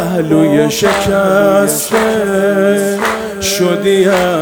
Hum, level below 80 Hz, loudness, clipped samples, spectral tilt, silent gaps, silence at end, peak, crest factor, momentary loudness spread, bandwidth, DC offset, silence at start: none; -42 dBFS; -11 LUFS; under 0.1%; -4.5 dB/octave; none; 0 s; 0 dBFS; 12 dB; 4 LU; over 20 kHz; under 0.1%; 0 s